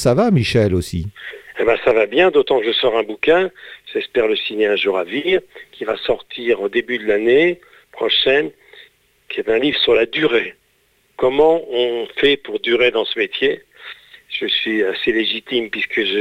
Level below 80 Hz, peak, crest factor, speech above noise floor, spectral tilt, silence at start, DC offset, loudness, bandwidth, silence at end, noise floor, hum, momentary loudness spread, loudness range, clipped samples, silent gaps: -46 dBFS; -4 dBFS; 14 dB; 43 dB; -5.5 dB/octave; 0 s; under 0.1%; -17 LUFS; 14 kHz; 0 s; -60 dBFS; none; 12 LU; 3 LU; under 0.1%; none